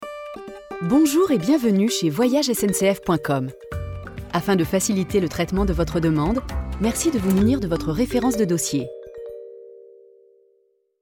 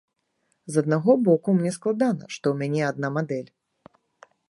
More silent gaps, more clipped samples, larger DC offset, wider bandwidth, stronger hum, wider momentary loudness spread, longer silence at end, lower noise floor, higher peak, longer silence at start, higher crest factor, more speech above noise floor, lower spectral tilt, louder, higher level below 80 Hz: neither; neither; neither; first, 18 kHz vs 11.5 kHz; neither; first, 16 LU vs 8 LU; first, 1.2 s vs 1.05 s; second, -64 dBFS vs -73 dBFS; about the same, -6 dBFS vs -6 dBFS; second, 0 s vs 0.7 s; about the same, 16 dB vs 20 dB; second, 44 dB vs 50 dB; second, -5.5 dB/octave vs -7 dB/octave; first, -21 LUFS vs -24 LUFS; first, -36 dBFS vs -74 dBFS